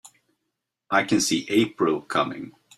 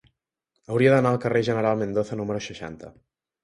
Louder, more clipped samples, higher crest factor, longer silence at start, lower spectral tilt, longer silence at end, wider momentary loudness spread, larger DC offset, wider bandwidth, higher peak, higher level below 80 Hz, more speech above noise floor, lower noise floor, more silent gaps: about the same, -23 LUFS vs -23 LUFS; neither; about the same, 18 dB vs 20 dB; second, 0.05 s vs 0.7 s; second, -3.5 dB/octave vs -7 dB/octave; second, 0.3 s vs 0.55 s; second, 5 LU vs 18 LU; neither; first, 14.5 kHz vs 11.5 kHz; about the same, -6 dBFS vs -6 dBFS; second, -64 dBFS vs -58 dBFS; about the same, 58 dB vs 55 dB; about the same, -81 dBFS vs -78 dBFS; neither